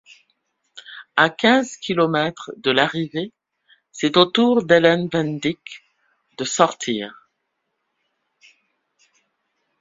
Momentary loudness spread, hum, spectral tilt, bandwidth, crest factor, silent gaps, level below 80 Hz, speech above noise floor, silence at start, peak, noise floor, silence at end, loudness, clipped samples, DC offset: 19 LU; none; -4.5 dB/octave; 7.8 kHz; 22 dB; none; -62 dBFS; 56 dB; 0.75 s; 0 dBFS; -75 dBFS; 2.7 s; -19 LUFS; under 0.1%; under 0.1%